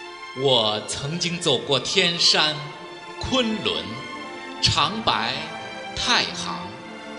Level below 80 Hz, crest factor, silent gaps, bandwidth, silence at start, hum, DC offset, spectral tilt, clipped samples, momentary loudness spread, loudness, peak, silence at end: -48 dBFS; 22 dB; none; 11.5 kHz; 0 s; none; under 0.1%; -3 dB/octave; under 0.1%; 17 LU; -21 LUFS; -2 dBFS; 0 s